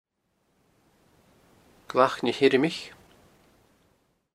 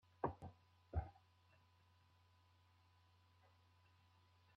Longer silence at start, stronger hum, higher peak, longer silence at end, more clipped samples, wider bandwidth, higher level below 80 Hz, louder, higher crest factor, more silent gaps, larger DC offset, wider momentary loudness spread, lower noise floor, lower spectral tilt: first, 1.9 s vs 0.25 s; neither; first, -4 dBFS vs -28 dBFS; second, 1.45 s vs 3.45 s; neither; first, 13.5 kHz vs 6.2 kHz; second, -70 dBFS vs -62 dBFS; first, -24 LUFS vs -50 LUFS; about the same, 26 dB vs 28 dB; neither; neither; about the same, 14 LU vs 12 LU; about the same, -73 dBFS vs -74 dBFS; second, -5 dB/octave vs -7.5 dB/octave